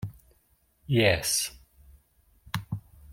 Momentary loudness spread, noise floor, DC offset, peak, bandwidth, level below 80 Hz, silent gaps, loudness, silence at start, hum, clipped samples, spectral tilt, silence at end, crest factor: 17 LU; -67 dBFS; under 0.1%; -8 dBFS; 16.5 kHz; -54 dBFS; none; -27 LUFS; 0 s; none; under 0.1%; -3.5 dB/octave; 0 s; 24 dB